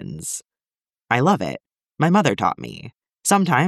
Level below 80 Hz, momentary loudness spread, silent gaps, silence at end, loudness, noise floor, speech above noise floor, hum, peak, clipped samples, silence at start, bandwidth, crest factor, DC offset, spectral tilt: -60 dBFS; 16 LU; none; 0 s; -20 LUFS; under -90 dBFS; over 71 dB; none; -2 dBFS; under 0.1%; 0 s; 14 kHz; 20 dB; under 0.1%; -5 dB/octave